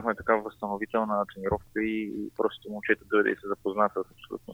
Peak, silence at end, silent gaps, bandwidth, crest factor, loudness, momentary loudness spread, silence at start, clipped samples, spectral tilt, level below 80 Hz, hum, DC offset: -8 dBFS; 0 s; none; 16.5 kHz; 22 dB; -29 LUFS; 9 LU; 0 s; under 0.1%; -7 dB/octave; -56 dBFS; none; under 0.1%